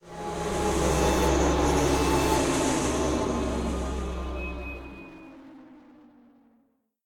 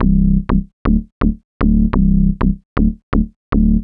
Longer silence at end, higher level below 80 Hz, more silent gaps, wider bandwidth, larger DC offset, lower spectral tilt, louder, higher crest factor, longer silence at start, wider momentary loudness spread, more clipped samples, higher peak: first, 1.25 s vs 0 s; second, -34 dBFS vs -18 dBFS; second, none vs 0.73-0.85 s, 1.12-1.21 s, 1.44-1.60 s, 2.65-2.76 s, 3.03-3.12 s, 3.36-3.52 s; first, 17.5 kHz vs 4.4 kHz; neither; second, -5 dB/octave vs -12 dB/octave; second, -26 LUFS vs -17 LUFS; about the same, 16 dB vs 14 dB; about the same, 0.05 s vs 0 s; first, 17 LU vs 6 LU; neither; second, -12 dBFS vs 0 dBFS